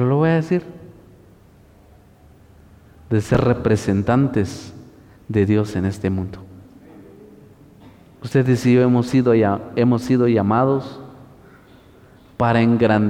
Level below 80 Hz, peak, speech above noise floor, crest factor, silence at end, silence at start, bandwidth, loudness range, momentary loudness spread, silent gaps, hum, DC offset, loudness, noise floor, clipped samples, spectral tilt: -48 dBFS; -6 dBFS; 32 dB; 14 dB; 0 s; 0 s; 13 kHz; 7 LU; 14 LU; none; none; under 0.1%; -18 LUFS; -49 dBFS; under 0.1%; -8 dB/octave